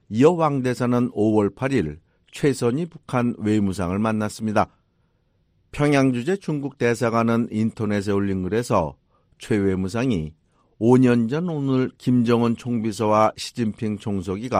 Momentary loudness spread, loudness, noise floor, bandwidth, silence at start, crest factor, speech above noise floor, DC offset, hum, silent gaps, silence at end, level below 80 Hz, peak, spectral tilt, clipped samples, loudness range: 9 LU; -22 LUFS; -65 dBFS; 15.5 kHz; 0.1 s; 18 dB; 44 dB; under 0.1%; none; none; 0 s; -52 dBFS; -4 dBFS; -7 dB/octave; under 0.1%; 3 LU